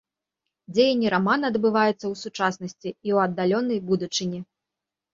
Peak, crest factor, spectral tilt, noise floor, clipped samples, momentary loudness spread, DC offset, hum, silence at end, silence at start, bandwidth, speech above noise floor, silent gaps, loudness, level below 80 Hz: -6 dBFS; 18 dB; -5 dB/octave; -87 dBFS; under 0.1%; 11 LU; under 0.1%; none; 0.7 s; 0.7 s; 7.6 kHz; 63 dB; none; -24 LUFS; -66 dBFS